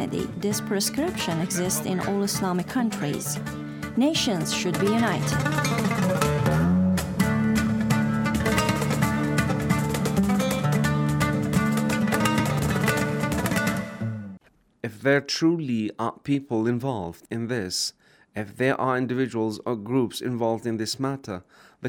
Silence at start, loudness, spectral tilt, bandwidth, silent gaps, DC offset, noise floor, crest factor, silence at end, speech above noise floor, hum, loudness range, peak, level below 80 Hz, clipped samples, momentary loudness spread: 0 s; -25 LUFS; -5 dB/octave; 19 kHz; none; under 0.1%; -52 dBFS; 16 dB; 0 s; 26 dB; none; 4 LU; -8 dBFS; -48 dBFS; under 0.1%; 8 LU